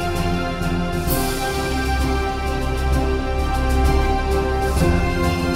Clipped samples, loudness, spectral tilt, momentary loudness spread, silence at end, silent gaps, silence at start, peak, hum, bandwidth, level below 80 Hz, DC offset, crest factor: under 0.1%; -21 LUFS; -5.5 dB/octave; 4 LU; 0 s; none; 0 s; -6 dBFS; none; 16 kHz; -22 dBFS; under 0.1%; 14 dB